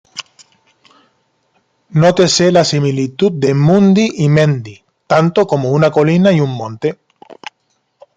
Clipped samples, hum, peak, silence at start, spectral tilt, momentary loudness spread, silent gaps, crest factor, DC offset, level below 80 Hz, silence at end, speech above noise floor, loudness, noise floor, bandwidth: under 0.1%; none; 0 dBFS; 0.15 s; -6 dB/octave; 20 LU; none; 14 dB; under 0.1%; -54 dBFS; 0.85 s; 52 dB; -12 LUFS; -64 dBFS; 9.2 kHz